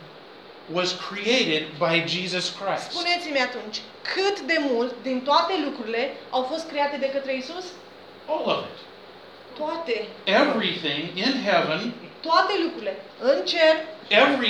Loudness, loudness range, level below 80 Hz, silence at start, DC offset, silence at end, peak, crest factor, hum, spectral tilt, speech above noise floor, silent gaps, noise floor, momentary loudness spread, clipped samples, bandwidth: -24 LUFS; 6 LU; -78 dBFS; 0 s; under 0.1%; 0 s; -4 dBFS; 20 dB; none; -3.5 dB/octave; 21 dB; none; -45 dBFS; 14 LU; under 0.1%; 11.5 kHz